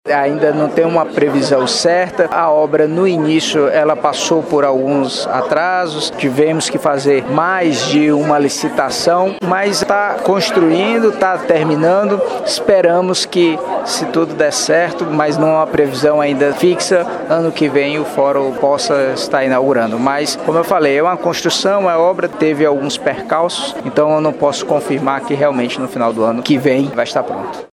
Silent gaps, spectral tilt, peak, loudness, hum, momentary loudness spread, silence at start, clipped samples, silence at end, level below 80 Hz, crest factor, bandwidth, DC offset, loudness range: none; -4.5 dB/octave; 0 dBFS; -14 LUFS; none; 4 LU; 0.05 s; under 0.1%; 0.1 s; -56 dBFS; 14 dB; 16 kHz; under 0.1%; 2 LU